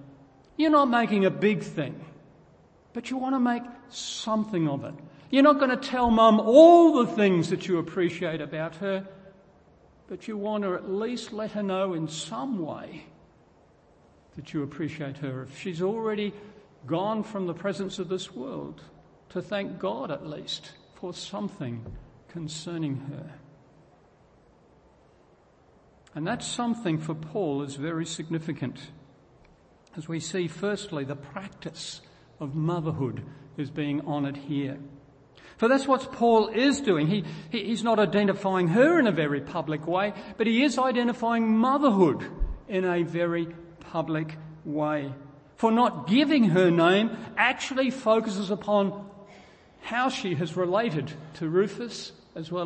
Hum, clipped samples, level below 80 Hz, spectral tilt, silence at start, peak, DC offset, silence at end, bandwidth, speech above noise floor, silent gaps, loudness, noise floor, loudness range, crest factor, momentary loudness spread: none; under 0.1%; -52 dBFS; -6 dB/octave; 0 s; -4 dBFS; under 0.1%; 0 s; 8.8 kHz; 34 dB; none; -26 LUFS; -59 dBFS; 15 LU; 24 dB; 18 LU